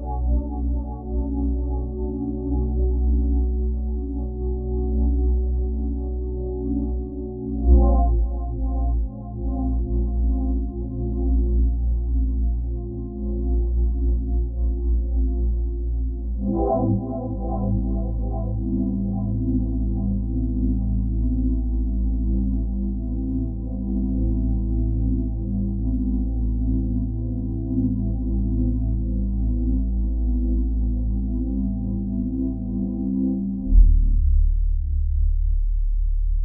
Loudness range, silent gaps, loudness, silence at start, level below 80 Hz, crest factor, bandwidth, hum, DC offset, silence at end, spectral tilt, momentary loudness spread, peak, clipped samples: 2 LU; none; -25 LUFS; 0 s; -22 dBFS; 18 dB; 1.1 kHz; none; under 0.1%; 0 s; -9 dB/octave; 6 LU; -4 dBFS; under 0.1%